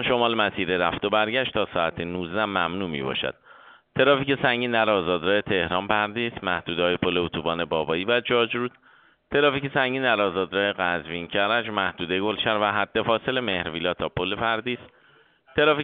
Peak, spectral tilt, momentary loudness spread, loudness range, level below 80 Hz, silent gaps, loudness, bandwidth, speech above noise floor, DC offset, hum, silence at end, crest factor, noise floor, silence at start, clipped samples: -4 dBFS; -2 dB/octave; 6 LU; 2 LU; -54 dBFS; none; -24 LUFS; 4.7 kHz; 34 dB; under 0.1%; none; 0 s; 22 dB; -58 dBFS; 0 s; under 0.1%